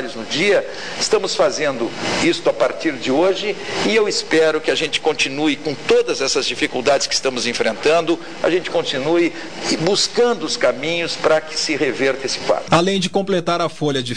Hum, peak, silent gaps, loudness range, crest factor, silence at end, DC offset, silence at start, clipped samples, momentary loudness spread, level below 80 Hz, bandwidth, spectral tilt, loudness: none; -2 dBFS; none; 1 LU; 16 dB; 0 s; 2%; 0 s; under 0.1%; 5 LU; -54 dBFS; 10.5 kHz; -3.5 dB/octave; -18 LUFS